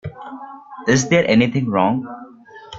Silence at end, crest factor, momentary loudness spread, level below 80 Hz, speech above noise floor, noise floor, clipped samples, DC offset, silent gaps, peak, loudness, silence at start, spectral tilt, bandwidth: 0 s; 16 dB; 21 LU; -52 dBFS; 24 dB; -41 dBFS; under 0.1%; under 0.1%; none; -2 dBFS; -17 LUFS; 0.05 s; -5 dB/octave; 8 kHz